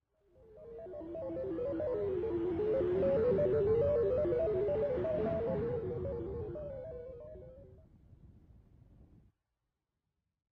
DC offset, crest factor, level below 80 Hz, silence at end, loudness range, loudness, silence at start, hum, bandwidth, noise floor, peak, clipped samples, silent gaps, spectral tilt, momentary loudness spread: under 0.1%; 14 dB; -54 dBFS; 1.55 s; 16 LU; -34 LUFS; 0.5 s; none; 5.4 kHz; -88 dBFS; -22 dBFS; under 0.1%; none; -10.5 dB/octave; 18 LU